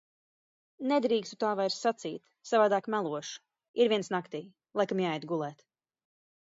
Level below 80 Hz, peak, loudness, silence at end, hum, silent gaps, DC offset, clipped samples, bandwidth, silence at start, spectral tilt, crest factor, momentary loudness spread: -82 dBFS; -14 dBFS; -31 LUFS; 0.95 s; none; 3.68-3.74 s; under 0.1%; under 0.1%; 7.8 kHz; 0.8 s; -5 dB/octave; 18 dB; 14 LU